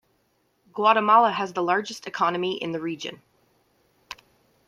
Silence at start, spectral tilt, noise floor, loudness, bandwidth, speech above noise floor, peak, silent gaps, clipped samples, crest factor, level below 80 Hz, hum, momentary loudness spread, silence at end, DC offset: 0.75 s; -4.5 dB/octave; -69 dBFS; -23 LUFS; 14 kHz; 46 dB; -4 dBFS; none; under 0.1%; 20 dB; -74 dBFS; none; 25 LU; 0.55 s; under 0.1%